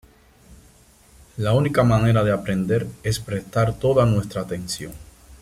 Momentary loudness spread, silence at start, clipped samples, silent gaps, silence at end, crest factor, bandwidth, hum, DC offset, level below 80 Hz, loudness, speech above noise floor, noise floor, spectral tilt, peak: 11 LU; 0.5 s; under 0.1%; none; 0.05 s; 16 dB; 15 kHz; none; under 0.1%; -44 dBFS; -21 LUFS; 32 dB; -52 dBFS; -6.5 dB/octave; -6 dBFS